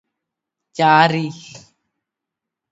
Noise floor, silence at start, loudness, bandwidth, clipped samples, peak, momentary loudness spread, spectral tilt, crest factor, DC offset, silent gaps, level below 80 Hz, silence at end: -84 dBFS; 0.8 s; -15 LUFS; 8 kHz; under 0.1%; 0 dBFS; 21 LU; -5.5 dB/octave; 20 dB; under 0.1%; none; -68 dBFS; 1.15 s